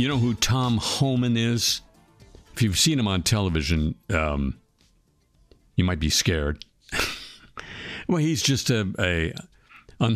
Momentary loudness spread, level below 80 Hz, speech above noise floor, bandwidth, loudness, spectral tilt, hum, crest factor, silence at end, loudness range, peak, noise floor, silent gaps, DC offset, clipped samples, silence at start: 15 LU; -38 dBFS; 40 dB; 15.5 kHz; -24 LUFS; -4 dB/octave; none; 18 dB; 0 s; 4 LU; -6 dBFS; -63 dBFS; none; under 0.1%; under 0.1%; 0 s